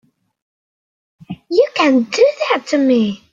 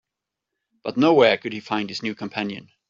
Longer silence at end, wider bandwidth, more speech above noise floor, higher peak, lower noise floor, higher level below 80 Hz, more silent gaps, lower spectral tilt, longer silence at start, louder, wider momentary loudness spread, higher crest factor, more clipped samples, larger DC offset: about the same, 0.15 s vs 0.25 s; about the same, 7.8 kHz vs 7.6 kHz; first, over 76 dB vs 63 dB; about the same, -2 dBFS vs -2 dBFS; first, under -90 dBFS vs -85 dBFS; about the same, -62 dBFS vs -66 dBFS; neither; about the same, -4.5 dB/octave vs -5.5 dB/octave; first, 1.3 s vs 0.85 s; first, -15 LUFS vs -22 LUFS; second, 7 LU vs 14 LU; about the same, 16 dB vs 20 dB; neither; neither